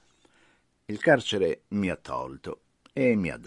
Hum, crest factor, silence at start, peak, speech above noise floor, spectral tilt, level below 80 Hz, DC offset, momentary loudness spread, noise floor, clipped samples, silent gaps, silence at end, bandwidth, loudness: none; 22 dB; 0.9 s; -6 dBFS; 38 dB; -5.5 dB/octave; -60 dBFS; under 0.1%; 17 LU; -65 dBFS; under 0.1%; none; 0 s; 11 kHz; -27 LUFS